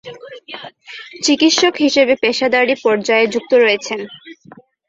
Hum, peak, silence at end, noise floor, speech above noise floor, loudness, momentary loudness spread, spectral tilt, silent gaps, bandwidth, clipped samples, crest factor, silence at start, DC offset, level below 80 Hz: none; 0 dBFS; 0.55 s; -44 dBFS; 30 dB; -14 LUFS; 20 LU; -2.5 dB/octave; none; 8 kHz; under 0.1%; 16 dB; 0.05 s; under 0.1%; -60 dBFS